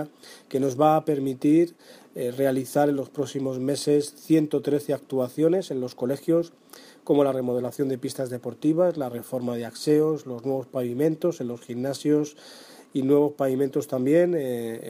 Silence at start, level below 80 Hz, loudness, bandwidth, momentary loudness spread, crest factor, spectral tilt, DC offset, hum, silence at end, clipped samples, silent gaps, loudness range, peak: 0 s; -74 dBFS; -25 LUFS; 15.5 kHz; 10 LU; 16 dB; -6.5 dB/octave; under 0.1%; none; 0 s; under 0.1%; none; 2 LU; -8 dBFS